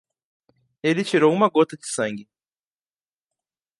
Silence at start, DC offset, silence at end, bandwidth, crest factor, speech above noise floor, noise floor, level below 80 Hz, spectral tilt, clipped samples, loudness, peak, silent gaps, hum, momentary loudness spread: 0.85 s; under 0.1%; 1.55 s; 11.5 kHz; 20 dB; over 70 dB; under -90 dBFS; -74 dBFS; -5 dB/octave; under 0.1%; -21 LUFS; -4 dBFS; none; none; 10 LU